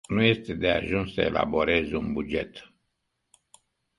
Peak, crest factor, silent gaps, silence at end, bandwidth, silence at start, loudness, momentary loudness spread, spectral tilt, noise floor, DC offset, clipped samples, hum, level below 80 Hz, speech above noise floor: -6 dBFS; 22 dB; none; 1.4 s; 11.5 kHz; 0.1 s; -26 LUFS; 8 LU; -6.5 dB/octave; -78 dBFS; under 0.1%; under 0.1%; none; -48 dBFS; 52 dB